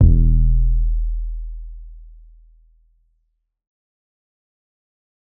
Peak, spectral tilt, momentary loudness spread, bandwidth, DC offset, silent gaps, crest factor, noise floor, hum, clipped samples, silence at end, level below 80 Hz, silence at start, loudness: 0 dBFS; -17.5 dB/octave; 23 LU; 0.7 kHz; under 0.1%; none; 20 dB; -70 dBFS; none; under 0.1%; 3.35 s; -20 dBFS; 0 s; -21 LUFS